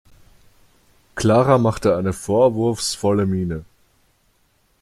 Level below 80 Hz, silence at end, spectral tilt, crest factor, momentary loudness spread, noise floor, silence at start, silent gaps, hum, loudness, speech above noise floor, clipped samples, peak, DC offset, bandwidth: -48 dBFS; 1.2 s; -6 dB/octave; 18 dB; 10 LU; -62 dBFS; 1.15 s; none; none; -19 LUFS; 44 dB; under 0.1%; -2 dBFS; under 0.1%; 14.5 kHz